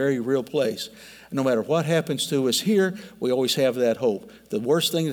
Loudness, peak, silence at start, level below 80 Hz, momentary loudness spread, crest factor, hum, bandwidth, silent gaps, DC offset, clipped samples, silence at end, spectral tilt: -23 LUFS; -10 dBFS; 0 s; -68 dBFS; 9 LU; 14 dB; none; 19.5 kHz; none; under 0.1%; under 0.1%; 0 s; -4.5 dB/octave